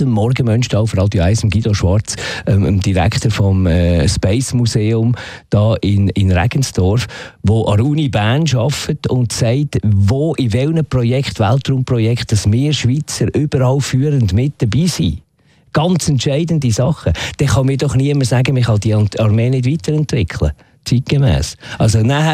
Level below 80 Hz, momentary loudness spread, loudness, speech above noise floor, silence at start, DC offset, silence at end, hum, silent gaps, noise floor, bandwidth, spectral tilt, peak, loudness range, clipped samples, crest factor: -32 dBFS; 4 LU; -15 LUFS; 39 dB; 0 s; under 0.1%; 0 s; none; none; -52 dBFS; 14 kHz; -6 dB/octave; -2 dBFS; 1 LU; under 0.1%; 12 dB